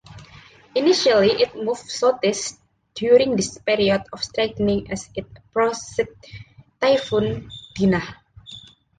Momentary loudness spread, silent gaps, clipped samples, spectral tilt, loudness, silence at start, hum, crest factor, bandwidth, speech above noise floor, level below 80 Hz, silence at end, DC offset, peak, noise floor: 19 LU; none; under 0.1%; -4.5 dB/octave; -21 LUFS; 0.1 s; none; 18 dB; 9.6 kHz; 27 dB; -50 dBFS; 0.4 s; under 0.1%; -4 dBFS; -47 dBFS